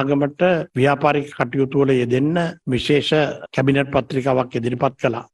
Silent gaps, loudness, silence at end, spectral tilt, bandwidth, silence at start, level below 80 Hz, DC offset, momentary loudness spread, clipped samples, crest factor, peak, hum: none; -19 LUFS; 0.1 s; -7 dB/octave; 11.5 kHz; 0 s; -50 dBFS; under 0.1%; 5 LU; under 0.1%; 16 dB; -2 dBFS; none